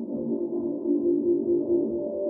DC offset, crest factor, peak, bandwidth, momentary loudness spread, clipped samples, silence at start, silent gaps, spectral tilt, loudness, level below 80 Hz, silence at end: under 0.1%; 12 dB; -14 dBFS; 1.1 kHz; 5 LU; under 0.1%; 0 s; none; -14.5 dB/octave; -26 LUFS; -62 dBFS; 0 s